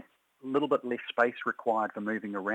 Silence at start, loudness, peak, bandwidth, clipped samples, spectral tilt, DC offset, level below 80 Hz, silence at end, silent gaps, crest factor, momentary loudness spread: 0.45 s; -31 LUFS; -10 dBFS; 9.2 kHz; under 0.1%; -6.5 dB/octave; under 0.1%; -84 dBFS; 0 s; none; 20 dB; 5 LU